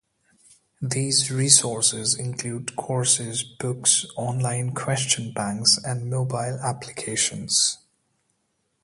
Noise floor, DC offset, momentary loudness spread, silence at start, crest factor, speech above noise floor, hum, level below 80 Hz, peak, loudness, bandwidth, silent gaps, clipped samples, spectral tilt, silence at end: -73 dBFS; under 0.1%; 12 LU; 0.8 s; 24 dB; 49 dB; none; -62 dBFS; 0 dBFS; -22 LUFS; 11.5 kHz; none; under 0.1%; -2.5 dB/octave; 1.05 s